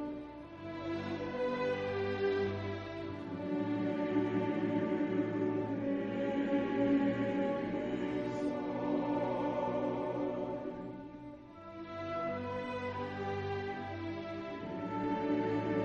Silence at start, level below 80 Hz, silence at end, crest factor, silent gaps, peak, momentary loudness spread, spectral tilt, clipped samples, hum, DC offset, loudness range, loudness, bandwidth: 0 s; -64 dBFS; 0 s; 14 dB; none; -20 dBFS; 10 LU; -8 dB/octave; under 0.1%; none; under 0.1%; 6 LU; -36 LUFS; 7.2 kHz